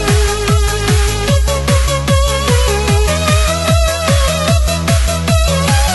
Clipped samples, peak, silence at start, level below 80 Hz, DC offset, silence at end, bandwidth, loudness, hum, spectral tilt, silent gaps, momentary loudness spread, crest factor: under 0.1%; 0 dBFS; 0 s; -16 dBFS; under 0.1%; 0 s; 12.5 kHz; -13 LUFS; none; -4.5 dB/octave; none; 1 LU; 12 dB